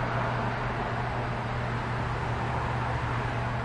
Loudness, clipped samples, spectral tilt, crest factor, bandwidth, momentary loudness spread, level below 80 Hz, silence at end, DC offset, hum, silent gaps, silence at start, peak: -30 LUFS; under 0.1%; -7 dB/octave; 12 dB; 10 kHz; 2 LU; -42 dBFS; 0 s; under 0.1%; none; none; 0 s; -18 dBFS